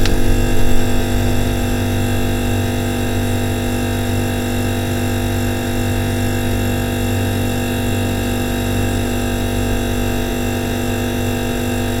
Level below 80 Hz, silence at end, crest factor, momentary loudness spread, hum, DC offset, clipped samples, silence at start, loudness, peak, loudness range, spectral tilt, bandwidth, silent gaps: -24 dBFS; 0 s; 16 dB; 1 LU; none; 0.4%; under 0.1%; 0 s; -19 LUFS; 0 dBFS; 1 LU; -5.5 dB/octave; 16.5 kHz; none